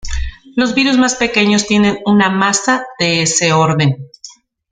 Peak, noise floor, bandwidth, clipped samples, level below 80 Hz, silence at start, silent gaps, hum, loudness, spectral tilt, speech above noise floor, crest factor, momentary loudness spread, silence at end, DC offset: 0 dBFS; -39 dBFS; 9.6 kHz; under 0.1%; -32 dBFS; 0.05 s; none; none; -13 LUFS; -4 dB/octave; 26 dB; 14 dB; 10 LU; 0.4 s; under 0.1%